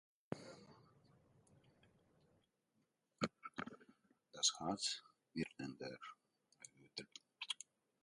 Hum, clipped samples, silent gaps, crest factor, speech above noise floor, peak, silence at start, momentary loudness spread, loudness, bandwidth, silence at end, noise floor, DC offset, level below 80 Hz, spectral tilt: none; under 0.1%; none; 28 dB; 40 dB; -22 dBFS; 0.3 s; 23 LU; -45 LUFS; 11.5 kHz; 0.5 s; -84 dBFS; under 0.1%; -82 dBFS; -2 dB/octave